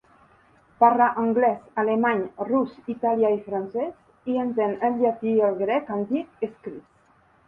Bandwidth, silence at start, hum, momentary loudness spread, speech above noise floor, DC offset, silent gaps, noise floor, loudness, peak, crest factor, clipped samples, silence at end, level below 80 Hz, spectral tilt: 4.4 kHz; 0.8 s; none; 12 LU; 36 dB; under 0.1%; none; -60 dBFS; -24 LUFS; -4 dBFS; 20 dB; under 0.1%; 0.65 s; -68 dBFS; -9 dB/octave